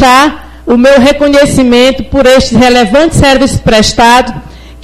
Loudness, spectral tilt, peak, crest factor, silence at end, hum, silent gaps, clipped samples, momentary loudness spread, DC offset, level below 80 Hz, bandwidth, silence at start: -5 LUFS; -4.5 dB/octave; 0 dBFS; 6 dB; 0.1 s; none; none; 3%; 6 LU; under 0.1%; -24 dBFS; 16 kHz; 0 s